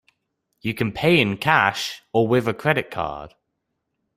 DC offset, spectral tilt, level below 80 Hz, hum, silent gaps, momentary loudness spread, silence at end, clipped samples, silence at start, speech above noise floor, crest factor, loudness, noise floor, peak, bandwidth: under 0.1%; -5.5 dB/octave; -54 dBFS; none; none; 12 LU; 0.9 s; under 0.1%; 0.65 s; 56 dB; 22 dB; -21 LUFS; -77 dBFS; -2 dBFS; 16 kHz